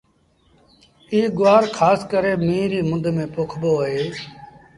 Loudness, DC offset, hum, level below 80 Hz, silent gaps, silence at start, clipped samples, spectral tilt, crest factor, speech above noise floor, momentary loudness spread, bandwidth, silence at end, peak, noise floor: -19 LUFS; under 0.1%; none; -54 dBFS; none; 1.1 s; under 0.1%; -6.5 dB/octave; 18 dB; 41 dB; 11 LU; 11.5 kHz; 0.3 s; -2 dBFS; -60 dBFS